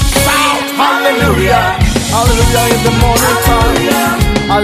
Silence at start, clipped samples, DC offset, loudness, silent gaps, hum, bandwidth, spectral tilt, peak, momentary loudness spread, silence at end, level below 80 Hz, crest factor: 0 s; under 0.1%; under 0.1%; -10 LUFS; none; none; 16 kHz; -4 dB/octave; 0 dBFS; 2 LU; 0 s; -18 dBFS; 10 dB